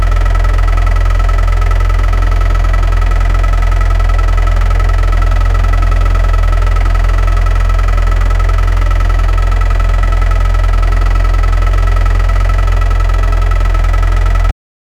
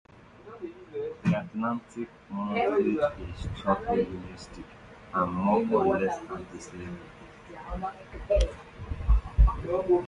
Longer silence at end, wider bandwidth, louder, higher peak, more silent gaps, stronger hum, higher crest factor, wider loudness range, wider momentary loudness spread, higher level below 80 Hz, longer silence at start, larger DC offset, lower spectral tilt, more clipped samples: first, 0.5 s vs 0 s; second, 7.4 kHz vs 10 kHz; first, -13 LUFS vs -29 LUFS; first, 0 dBFS vs -8 dBFS; neither; neither; second, 8 dB vs 20 dB; about the same, 0 LU vs 2 LU; second, 1 LU vs 19 LU; first, -10 dBFS vs -34 dBFS; second, 0 s vs 0.45 s; neither; second, -6 dB/octave vs -7.5 dB/octave; neither